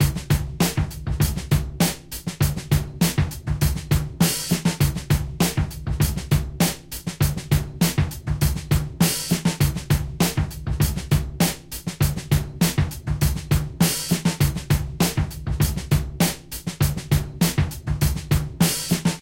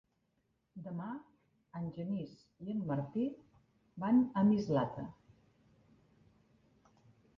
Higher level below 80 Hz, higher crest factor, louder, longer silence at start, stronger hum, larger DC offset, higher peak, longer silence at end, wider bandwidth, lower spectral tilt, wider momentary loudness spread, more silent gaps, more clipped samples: first, -30 dBFS vs -72 dBFS; about the same, 16 dB vs 18 dB; first, -23 LUFS vs -36 LUFS; second, 0 s vs 0.75 s; neither; neither; first, -6 dBFS vs -20 dBFS; second, 0 s vs 2.25 s; first, 17 kHz vs 6.6 kHz; second, -5 dB/octave vs -8.5 dB/octave; second, 5 LU vs 20 LU; neither; neither